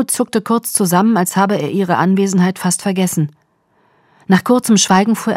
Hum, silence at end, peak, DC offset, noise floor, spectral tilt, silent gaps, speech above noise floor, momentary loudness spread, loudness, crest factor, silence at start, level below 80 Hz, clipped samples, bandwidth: none; 0 s; 0 dBFS; under 0.1%; -58 dBFS; -4.5 dB/octave; none; 44 dB; 5 LU; -14 LUFS; 14 dB; 0 s; -60 dBFS; under 0.1%; 16 kHz